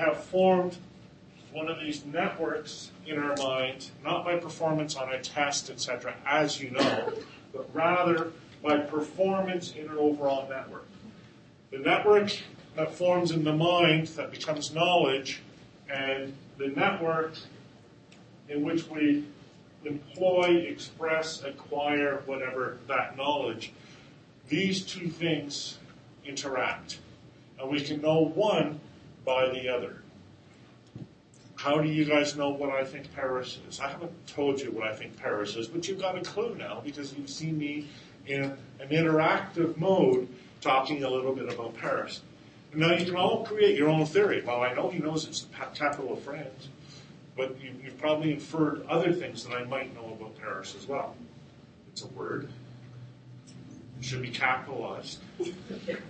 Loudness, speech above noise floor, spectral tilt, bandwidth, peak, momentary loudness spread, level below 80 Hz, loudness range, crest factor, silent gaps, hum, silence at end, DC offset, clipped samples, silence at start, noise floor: -29 LUFS; 25 dB; -5 dB/octave; 8.8 kHz; -8 dBFS; 18 LU; -68 dBFS; 7 LU; 22 dB; none; none; 0 s; under 0.1%; under 0.1%; 0 s; -55 dBFS